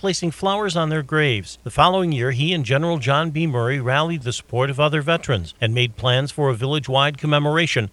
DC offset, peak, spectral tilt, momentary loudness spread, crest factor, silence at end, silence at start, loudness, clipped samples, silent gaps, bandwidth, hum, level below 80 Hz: under 0.1%; 0 dBFS; -5.5 dB/octave; 5 LU; 20 dB; 0.05 s; 0.05 s; -20 LUFS; under 0.1%; none; 12 kHz; none; -48 dBFS